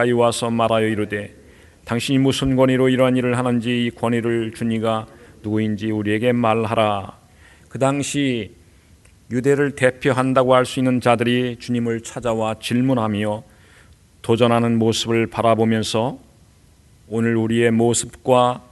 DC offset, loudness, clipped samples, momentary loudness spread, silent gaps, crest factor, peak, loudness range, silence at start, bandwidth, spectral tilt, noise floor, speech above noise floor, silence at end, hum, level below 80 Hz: under 0.1%; -19 LUFS; under 0.1%; 10 LU; none; 18 dB; 0 dBFS; 3 LU; 0 s; 12 kHz; -5.5 dB/octave; -51 dBFS; 33 dB; 0.1 s; none; -50 dBFS